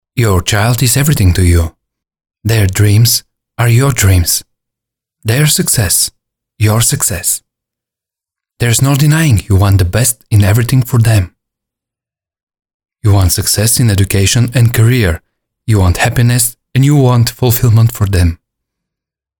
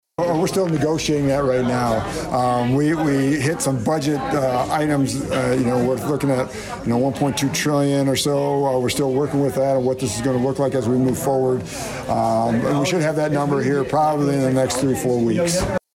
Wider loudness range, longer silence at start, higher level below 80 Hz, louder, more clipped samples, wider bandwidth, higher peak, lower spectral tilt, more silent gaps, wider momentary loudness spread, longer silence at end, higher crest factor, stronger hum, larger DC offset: about the same, 3 LU vs 1 LU; about the same, 0.15 s vs 0.2 s; first, -28 dBFS vs -44 dBFS; first, -10 LUFS vs -20 LUFS; neither; first, 19.5 kHz vs 16.5 kHz; first, 0 dBFS vs -10 dBFS; about the same, -4.5 dB/octave vs -5.5 dB/octave; first, 12.43-12.47 s, 12.74-12.80 s vs none; first, 6 LU vs 3 LU; first, 1.05 s vs 0.2 s; about the same, 10 dB vs 10 dB; neither; neither